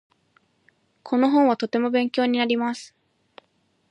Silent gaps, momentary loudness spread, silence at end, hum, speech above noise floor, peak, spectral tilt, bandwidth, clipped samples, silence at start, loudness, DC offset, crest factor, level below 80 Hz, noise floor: none; 8 LU; 1.05 s; none; 46 dB; -8 dBFS; -5 dB/octave; 10.5 kHz; under 0.1%; 1.05 s; -22 LUFS; under 0.1%; 16 dB; -78 dBFS; -67 dBFS